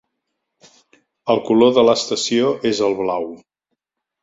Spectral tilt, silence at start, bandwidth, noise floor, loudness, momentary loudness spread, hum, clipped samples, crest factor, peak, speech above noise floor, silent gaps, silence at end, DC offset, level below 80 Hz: -4 dB/octave; 1.25 s; 8 kHz; -77 dBFS; -17 LUFS; 12 LU; none; under 0.1%; 18 dB; -2 dBFS; 61 dB; none; 0.85 s; under 0.1%; -60 dBFS